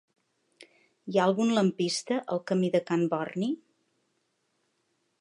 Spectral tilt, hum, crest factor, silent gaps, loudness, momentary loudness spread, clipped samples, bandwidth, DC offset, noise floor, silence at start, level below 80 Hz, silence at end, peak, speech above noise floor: -5.5 dB/octave; none; 20 dB; none; -28 LUFS; 8 LU; under 0.1%; 11.5 kHz; under 0.1%; -76 dBFS; 1.05 s; -80 dBFS; 1.65 s; -12 dBFS; 49 dB